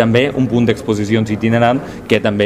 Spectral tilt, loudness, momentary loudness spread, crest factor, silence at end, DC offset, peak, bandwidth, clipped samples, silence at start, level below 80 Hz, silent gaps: -6.5 dB/octave; -15 LUFS; 4 LU; 14 dB; 0 s; under 0.1%; 0 dBFS; 13 kHz; under 0.1%; 0 s; -42 dBFS; none